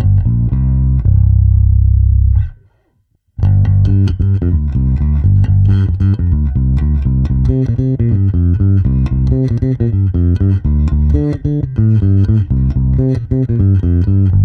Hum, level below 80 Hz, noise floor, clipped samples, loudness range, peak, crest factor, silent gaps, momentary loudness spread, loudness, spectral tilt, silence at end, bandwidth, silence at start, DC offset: none; -16 dBFS; -59 dBFS; under 0.1%; 1 LU; 0 dBFS; 10 dB; none; 4 LU; -13 LUFS; -11.5 dB/octave; 0 s; 4.3 kHz; 0 s; under 0.1%